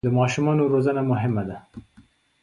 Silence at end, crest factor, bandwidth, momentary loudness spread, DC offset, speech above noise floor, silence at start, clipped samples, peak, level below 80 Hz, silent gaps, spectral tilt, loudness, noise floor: 0.65 s; 14 dB; 10.5 kHz; 11 LU; under 0.1%; 34 dB; 0.05 s; under 0.1%; -10 dBFS; -54 dBFS; none; -7.5 dB/octave; -22 LUFS; -56 dBFS